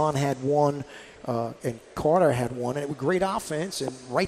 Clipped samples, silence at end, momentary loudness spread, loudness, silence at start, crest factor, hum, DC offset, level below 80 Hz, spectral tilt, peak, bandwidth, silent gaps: under 0.1%; 0 s; 12 LU; -26 LUFS; 0 s; 16 dB; none; under 0.1%; -56 dBFS; -6 dB/octave; -10 dBFS; 15 kHz; none